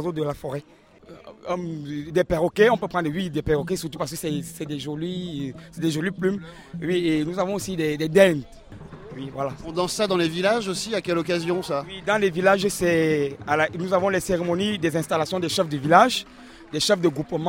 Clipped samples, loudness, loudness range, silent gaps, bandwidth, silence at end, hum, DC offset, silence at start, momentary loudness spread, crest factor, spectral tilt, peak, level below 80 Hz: under 0.1%; -23 LUFS; 5 LU; none; 16.5 kHz; 0 s; none; under 0.1%; 0 s; 13 LU; 22 dB; -5 dB/octave; -2 dBFS; -50 dBFS